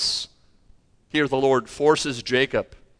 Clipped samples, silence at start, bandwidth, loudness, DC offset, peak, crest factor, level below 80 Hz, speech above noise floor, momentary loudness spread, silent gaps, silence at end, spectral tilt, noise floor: under 0.1%; 0 s; 10.5 kHz; -22 LUFS; under 0.1%; -6 dBFS; 18 dB; -54 dBFS; 34 dB; 8 LU; none; 0.25 s; -3.5 dB/octave; -55 dBFS